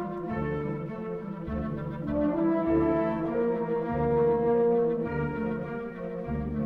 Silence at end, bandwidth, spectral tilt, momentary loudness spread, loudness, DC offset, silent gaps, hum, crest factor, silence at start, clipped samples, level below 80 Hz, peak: 0 s; 4.6 kHz; -10.5 dB/octave; 11 LU; -29 LUFS; under 0.1%; none; none; 14 dB; 0 s; under 0.1%; -46 dBFS; -14 dBFS